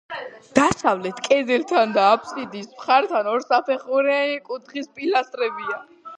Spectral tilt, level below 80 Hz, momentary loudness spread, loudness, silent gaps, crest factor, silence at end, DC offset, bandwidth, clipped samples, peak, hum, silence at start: -4 dB/octave; -60 dBFS; 14 LU; -21 LUFS; none; 22 dB; 0 s; under 0.1%; 10 kHz; under 0.1%; 0 dBFS; none; 0.1 s